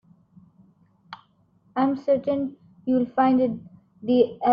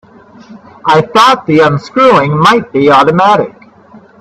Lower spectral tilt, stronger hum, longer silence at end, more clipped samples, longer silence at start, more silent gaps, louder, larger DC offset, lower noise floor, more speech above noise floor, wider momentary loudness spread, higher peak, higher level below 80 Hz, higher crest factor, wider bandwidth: first, -9 dB/octave vs -6 dB/octave; neither; second, 0 s vs 0.7 s; second, under 0.1% vs 0.2%; first, 1.1 s vs 0.5 s; neither; second, -24 LUFS vs -8 LUFS; neither; first, -62 dBFS vs -38 dBFS; first, 40 dB vs 30 dB; first, 24 LU vs 4 LU; second, -8 dBFS vs 0 dBFS; second, -66 dBFS vs -48 dBFS; first, 18 dB vs 10 dB; second, 5.2 kHz vs 14 kHz